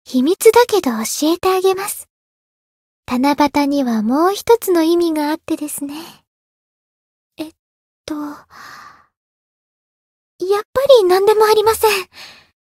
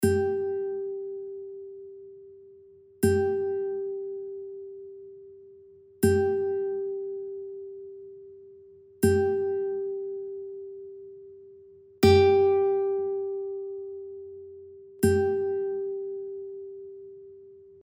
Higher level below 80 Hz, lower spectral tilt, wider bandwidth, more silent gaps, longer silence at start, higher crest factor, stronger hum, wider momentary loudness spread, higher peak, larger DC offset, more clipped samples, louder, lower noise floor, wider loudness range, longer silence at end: about the same, -56 dBFS vs -56 dBFS; second, -3.5 dB/octave vs -6.5 dB/octave; about the same, 16.5 kHz vs 16 kHz; first, 2.10-3.03 s, 6.27-7.30 s, 7.59-8.04 s, 9.17-10.39 s, 10.65-10.73 s vs none; about the same, 0.1 s vs 0 s; about the same, 18 dB vs 20 dB; neither; second, 19 LU vs 23 LU; first, 0 dBFS vs -8 dBFS; neither; neither; first, -15 LUFS vs -27 LUFS; first, under -90 dBFS vs -53 dBFS; first, 18 LU vs 6 LU; first, 0.3 s vs 0.05 s